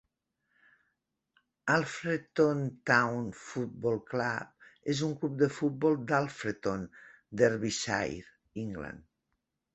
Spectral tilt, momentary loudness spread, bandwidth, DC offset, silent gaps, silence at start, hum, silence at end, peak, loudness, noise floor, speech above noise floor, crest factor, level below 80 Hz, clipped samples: -5.5 dB/octave; 14 LU; 8.4 kHz; under 0.1%; none; 1.65 s; none; 0.75 s; -10 dBFS; -31 LUFS; -83 dBFS; 52 dB; 24 dB; -64 dBFS; under 0.1%